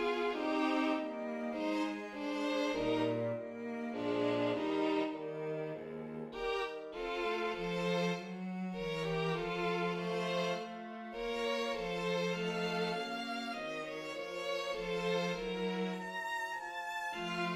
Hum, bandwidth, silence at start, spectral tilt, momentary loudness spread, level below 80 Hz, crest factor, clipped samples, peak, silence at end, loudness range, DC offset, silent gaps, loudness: none; 15.5 kHz; 0 s; -5.5 dB/octave; 7 LU; -64 dBFS; 16 dB; under 0.1%; -22 dBFS; 0 s; 2 LU; under 0.1%; none; -37 LUFS